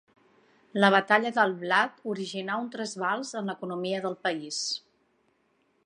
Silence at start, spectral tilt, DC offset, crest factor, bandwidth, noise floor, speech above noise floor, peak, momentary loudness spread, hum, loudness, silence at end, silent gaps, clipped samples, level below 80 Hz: 0.75 s; -3.5 dB/octave; under 0.1%; 24 dB; 11 kHz; -70 dBFS; 43 dB; -4 dBFS; 12 LU; none; -28 LUFS; 1.05 s; none; under 0.1%; -82 dBFS